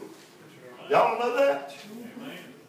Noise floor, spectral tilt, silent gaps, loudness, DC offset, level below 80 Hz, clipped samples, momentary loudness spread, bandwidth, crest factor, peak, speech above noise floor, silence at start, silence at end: -50 dBFS; -4.5 dB/octave; none; -25 LUFS; under 0.1%; -88 dBFS; under 0.1%; 22 LU; 16 kHz; 20 dB; -10 dBFS; 26 dB; 0 s; 0.15 s